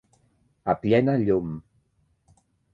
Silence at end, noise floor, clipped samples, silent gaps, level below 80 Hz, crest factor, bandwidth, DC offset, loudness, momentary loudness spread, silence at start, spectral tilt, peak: 1.15 s; -68 dBFS; under 0.1%; none; -54 dBFS; 20 dB; 8.4 kHz; under 0.1%; -24 LUFS; 14 LU; 0.65 s; -9.5 dB/octave; -6 dBFS